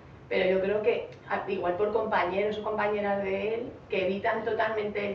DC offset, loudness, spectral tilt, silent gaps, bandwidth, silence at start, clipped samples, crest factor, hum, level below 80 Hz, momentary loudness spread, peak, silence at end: under 0.1%; -29 LUFS; -3.5 dB/octave; none; 6.8 kHz; 0 s; under 0.1%; 16 dB; none; -60 dBFS; 6 LU; -14 dBFS; 0 s